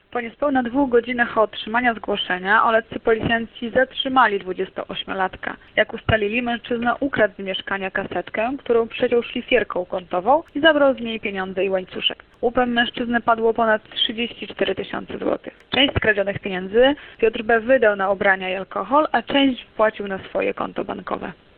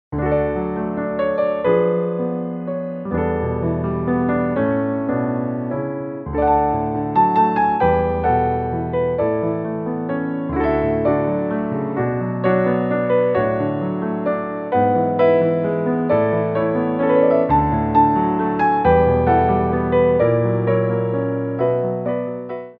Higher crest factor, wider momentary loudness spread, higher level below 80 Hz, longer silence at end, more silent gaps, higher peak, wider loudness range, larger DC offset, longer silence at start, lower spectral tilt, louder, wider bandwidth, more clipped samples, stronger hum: about the same, 20 dB vs 16 dB; about the same, 10 LU vs 8 LU; second, -48 dBFS vs -38 dBFS; first, 0.25 s vs 0.05 s; neither; about the same, 0 dBFS vs -2 dBFS; about the same, 3 LU vs 5 LU; neither; about the same, 0.1 s vs 0.1 s; second, -8.5 dB/octave vs -11.5 dB/octave; about the same, -21 LUFS vs -19 LUFS; about the same, 4.6 kHz vs 5 kHz; neither; neither